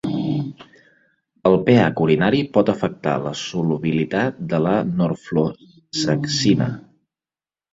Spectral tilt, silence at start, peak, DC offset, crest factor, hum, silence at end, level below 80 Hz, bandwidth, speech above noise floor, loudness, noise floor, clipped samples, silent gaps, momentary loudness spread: -6 dB/octave; 0.05 s; -2 dBFS; under 0.1%; 18 dB; none; 0.95 s; -54 dBFS; 8 kHz; over 71 dB; -20 LUFS; under -90 dBFS; under 0.1%; none; 10 LU